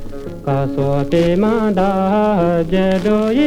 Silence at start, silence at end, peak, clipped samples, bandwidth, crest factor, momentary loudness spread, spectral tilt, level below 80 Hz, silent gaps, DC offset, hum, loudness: 0 s; 0 s; -4 dBFS; under 0.1%; 13 kHz; 12 dB; 5 LU; -8 dB/octave; -32 dBFS; none; under 0.1%; none; -16 LUFS